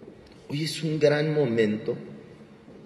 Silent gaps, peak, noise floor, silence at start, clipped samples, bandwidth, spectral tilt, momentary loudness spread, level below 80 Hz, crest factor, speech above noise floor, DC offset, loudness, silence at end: none; -8 dBFS; -48 dBFS; 0 s; under 0.1%; 12.5 kHz; -6 dB/octave; 15 LU; -66 dBFS; 18 dB; 23 dB; under 0.1%; -26 LUFS; 0 s